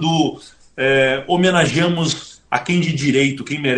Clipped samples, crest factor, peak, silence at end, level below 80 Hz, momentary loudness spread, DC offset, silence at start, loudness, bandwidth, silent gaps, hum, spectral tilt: under 0.1%; 18 dB; 0 dBFS; 0 s; -52 dBFS; 8 LU; under 0.1%; 0 s; -17 LUFS; 10 kHz; none; none; -5 dB/octave